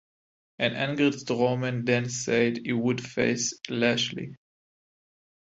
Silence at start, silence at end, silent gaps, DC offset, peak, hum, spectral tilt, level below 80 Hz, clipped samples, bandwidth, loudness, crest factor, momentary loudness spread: 0.6 s; 1.05 s; none; under 0.1%; -8 dBFS; none; -4.5 dB/octave; -66 dBFS; under 0.1%; 8.2 kHz; -26 LUFS; 20 dB; 4 LU